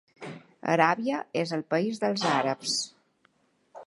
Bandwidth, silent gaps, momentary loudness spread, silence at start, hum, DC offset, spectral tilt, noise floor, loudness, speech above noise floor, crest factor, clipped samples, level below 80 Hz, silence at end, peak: 11.5 kHz; none; 16 LU; 0.2 s; none; under 0.1%; -4 dB/octave; -68 dBFS; -27 LUFS; 41 dB; 24 dB; under 0.1%; -78 dBFS; 0.05 s; -6 dBFS